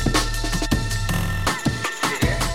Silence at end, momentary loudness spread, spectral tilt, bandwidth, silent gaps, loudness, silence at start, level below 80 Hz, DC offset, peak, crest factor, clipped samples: 0 s; 3 LU; -4 dB/octave; 16.5 kHz; none; -23 LUFS; 0 s; -28 dBFS; 0.8%; -4 dBFS; 16 dB; under 0.1%